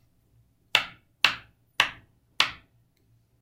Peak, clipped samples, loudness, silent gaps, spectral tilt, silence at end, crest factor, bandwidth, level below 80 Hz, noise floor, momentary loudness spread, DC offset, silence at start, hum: 0 dBFS; under 0.1%; -25 LUFS; none; 0 dB/octave; 0.85 s; 32 dB; 16 kHz; -64 dBFS; -65 dBFS; 15 LU; under 0.1%; 0.75 s; none